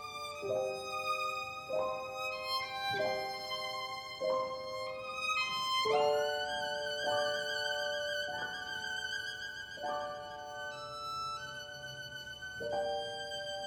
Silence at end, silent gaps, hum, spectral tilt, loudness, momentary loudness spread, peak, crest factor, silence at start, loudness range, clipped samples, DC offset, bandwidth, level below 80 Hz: 0 s; none; none; -2 dB/octave; -36 LUFS; 10 LU; -20 dBFS; 18 dB; 0 s; 7 LU; under 0.1%; under 0.1%; 19 kHz; -70 dBFS